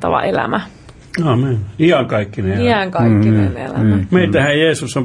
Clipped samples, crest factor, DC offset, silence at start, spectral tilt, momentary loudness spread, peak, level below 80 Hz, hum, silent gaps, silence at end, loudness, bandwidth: under 0.1%; 12 dB; under 0.1%; 0 s; -6.5 dB/octave; 7 LU; -2 dBFS; -44 dBFS; none; none; 0 s; -15 LUFS; 11.5 kHz